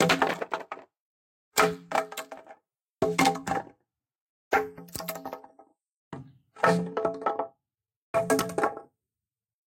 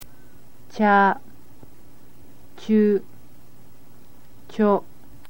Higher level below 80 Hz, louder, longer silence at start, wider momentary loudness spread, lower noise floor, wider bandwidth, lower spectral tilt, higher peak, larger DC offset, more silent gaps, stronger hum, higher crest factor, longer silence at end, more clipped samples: second, -66 dBFS vs -60 dBFS; second, -28 LUFS vs -20 LUFS; about the same, 0 s vs 0 s; about the same, 20 LU vs 20 LU; first, under -90 dBFS vs -52 dBFS; about the same, 17 kHz vs 17 kHz; second, -4 dB/octave vs -7.5 dB/octave; second, -8 dBFS vs -4 dBFS; second, under 0.1% vs 2%; first, 1.00-1.52 s, 4.15-4.51 s, 5.97-6.11 s, 7.96-8.14 s vs none; neither; about the same, 22 dB vs 20 dB; first, 0.9 s vs 0.5 s; neither